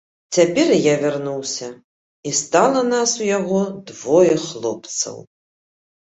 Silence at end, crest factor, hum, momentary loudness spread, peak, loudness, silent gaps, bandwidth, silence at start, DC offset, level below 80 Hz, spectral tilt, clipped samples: 0.9 s; 18 dB; none; 12 LU; -2 dBFS; -18 LUFS; 1.84-2.23 s; 8.4 kHz; 0.3 s; under 0.1%; -62 dBFS; -4 dB/octave; under 0.1%